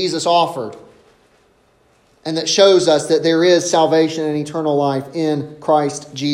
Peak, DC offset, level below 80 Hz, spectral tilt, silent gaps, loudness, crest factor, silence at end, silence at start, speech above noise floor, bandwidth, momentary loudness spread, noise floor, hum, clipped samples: 0 dBFS; under 0.1%; -64 dBFS; -4 dB/octave; none; -16 LUFS; 16 dB; 0 s; 0 s; 40 dB; 14 kHz; 11 LU; -56 dBFS; none; under 0.1%